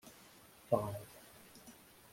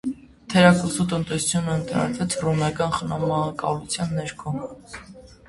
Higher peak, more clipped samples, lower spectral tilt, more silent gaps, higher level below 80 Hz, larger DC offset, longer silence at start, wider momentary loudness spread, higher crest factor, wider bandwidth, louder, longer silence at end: second, -18 dBFS vs 0 dBFS; neither; about the same, -6 dB/octave vs -5 dB/octave; neither; second, -72 dBFS vs -50 dBFS; neither; about the same, 0.05 s vs 0.05 s; first, 22 LU vs 16 LU; about the same, 26 dB vs 22 dB; first, 16.5 kHz vs 11.5 kHz; second, -39 LUFS vs -23 LUFS; first, 0.4 s vs 0.15 s